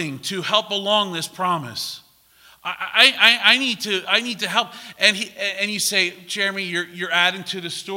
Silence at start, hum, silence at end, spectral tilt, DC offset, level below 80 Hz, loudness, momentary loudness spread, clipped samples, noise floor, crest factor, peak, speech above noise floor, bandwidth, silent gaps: 0 s; none; 0 s; -1.5 dB/octave; under 0.1%; -70 dBFS; -19 LUFS; 15 LU; under 0.1%; -52 dBFS; 22 dB; 0 dBFS; 31 dB; 16.5 kHz; none